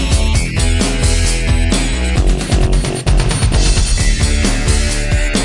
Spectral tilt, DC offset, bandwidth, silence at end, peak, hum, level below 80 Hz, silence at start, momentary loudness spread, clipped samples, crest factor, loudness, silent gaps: -4 dB/octave; under 0.1%; 11.5 kHz; 0 s; 0 dBFS; none; -14 dBFS; 0 s; 2 LU; under 0.1%; 12 dB; -15 LUFS; none